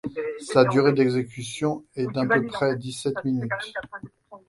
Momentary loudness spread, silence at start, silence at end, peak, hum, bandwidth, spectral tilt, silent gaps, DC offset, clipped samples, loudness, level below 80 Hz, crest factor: 13 LU; 0.05 s; 0.1 s; -2 dBFS; none; 11.5 kHz; -6 dB/octave; none; under 0.1%; under 0.1%; -24 LUFS; -62 dBFS; 22 dB